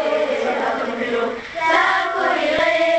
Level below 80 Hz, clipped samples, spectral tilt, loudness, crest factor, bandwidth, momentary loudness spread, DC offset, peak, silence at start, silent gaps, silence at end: -54 dBFS; under 0.1%; -3 dB/octave; -19 LUFS; 16 dB; 8.8 kHz; 7 LU; under 0.1%; -2 dBFS; 0 s; none; 0 s